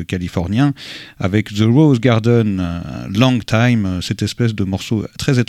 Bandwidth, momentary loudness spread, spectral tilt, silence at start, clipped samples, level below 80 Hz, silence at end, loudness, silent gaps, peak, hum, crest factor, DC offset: 13.5 kHz; 10 LU; -6.5 dB/octave; 0 s; under 0.1%; -42 dBFS; 0.05 s; -16 LUFS; none; 0 dBFS; none; 16 dB; under 0.1%